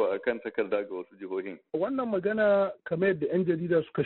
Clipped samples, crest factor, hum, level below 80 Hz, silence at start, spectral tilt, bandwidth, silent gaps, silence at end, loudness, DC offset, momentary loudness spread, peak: under 0.1%; 14 dB; none; -68 dBFS; 0 s; -6 dB/octave; 4.2 kHz; none; 0 s; -29 LUFS; under 0.1%; 11 LU; -14 dBFS